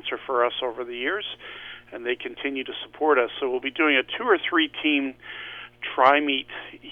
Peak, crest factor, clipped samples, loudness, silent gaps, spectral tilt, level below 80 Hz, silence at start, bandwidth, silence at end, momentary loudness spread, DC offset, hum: -4 dBFS; 22 dB; under 0.1%; -24 LUFS; none; -5 dB/octave; -64 dBFS; 0.05 s; 5.8 kHz; 0 s; 16 LU; under 0.1%; 60 Hz at -60 dBFS